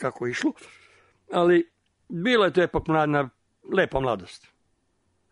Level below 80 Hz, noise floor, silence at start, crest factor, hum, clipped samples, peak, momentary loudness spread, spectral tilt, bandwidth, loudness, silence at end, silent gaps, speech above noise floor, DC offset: -50 dBFS; -70 dBFS; 0 s; 18 dB; none; under 0.1%; -8 dBFS; 13 LU; -6 dB/octave; 10.5 kHz; -24 LUFS; 0.95 s; none; 47 dB; under 0.1%